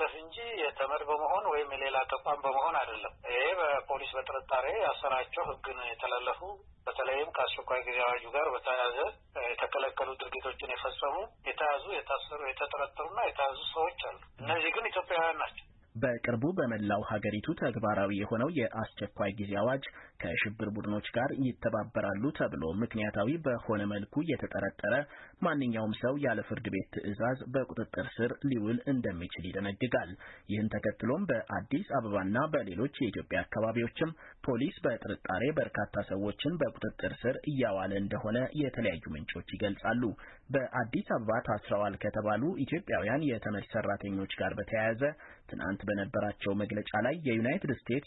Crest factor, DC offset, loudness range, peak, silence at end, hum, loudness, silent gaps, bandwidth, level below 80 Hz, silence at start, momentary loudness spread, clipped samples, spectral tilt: 16 dB; under 0.1%; 2 LU; -18 dBFS; 0.05 s; none; -34 LUFS; none; 4 kHz; -60 dBFS; 0 s; 6 LU; under 0.1%; -4.5 dB/octave